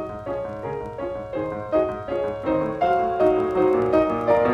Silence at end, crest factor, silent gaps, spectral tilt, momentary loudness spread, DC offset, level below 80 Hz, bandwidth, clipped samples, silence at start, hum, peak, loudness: 0 s; 16 dB; none; -8 dB/octave; 10 LU; under 0.1%; -48 dBFS; 7.6 kHz; under 0.1%; 0 s; none; -6 dBFS; -23 LUFS